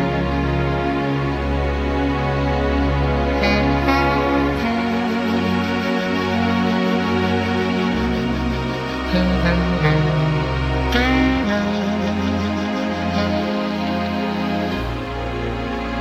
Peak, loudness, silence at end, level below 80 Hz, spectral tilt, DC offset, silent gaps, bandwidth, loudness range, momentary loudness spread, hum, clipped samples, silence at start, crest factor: -4 dBFS; -20 LUFS; 0 s; -28 dBFS; -7 dB/octave; under 0.1%; none; 14 kHz; 3 LU; 5 LU; none; under 0.1%; 0 s; 16 dB